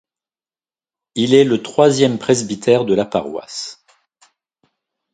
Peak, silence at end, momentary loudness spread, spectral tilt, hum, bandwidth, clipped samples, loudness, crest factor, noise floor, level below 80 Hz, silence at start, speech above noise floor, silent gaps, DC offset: 0 dBFS; 1.4 s; 15 LU; -5 dB/octave; none; 9.4 kHz; under 0.1%; -16 LUFS; 18 dB; under -90 dBFS; -58 dBFS; 1.15 s; over 75 dB; none; under 0.1%